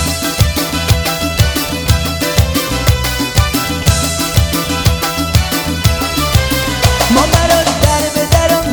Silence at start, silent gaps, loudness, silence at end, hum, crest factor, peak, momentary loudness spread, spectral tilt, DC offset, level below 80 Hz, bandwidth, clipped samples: 0 s; none; -13 LUFS; 0 s; none; 12 dB; 0 dBFS; 4 LU; -4 dB/octave; under 0.1%; -20 dBFS; over 20 kHz; under 0.1%